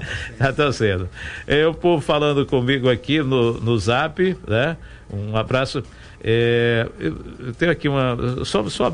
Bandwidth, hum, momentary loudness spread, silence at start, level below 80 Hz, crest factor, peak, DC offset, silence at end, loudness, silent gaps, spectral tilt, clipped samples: 10 kHz; none; 12 LU; 0 s; -42 dBFS; 16 dB; -4 dBFS; under 0.1%; 0 s; -20 LUFS; none; -6 dB/octave; under 0.1%